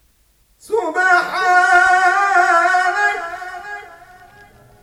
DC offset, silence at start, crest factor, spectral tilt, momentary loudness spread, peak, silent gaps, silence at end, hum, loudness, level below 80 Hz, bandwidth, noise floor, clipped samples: under 0.1%; 0.7 s; 16 dB; -1.5 dB/octave; 18 LU; -2 dBFS; none; 0.95 s; none; -14 LUFS; -56 dBFS; 14 kHz; -57 dBFS; under 0.1%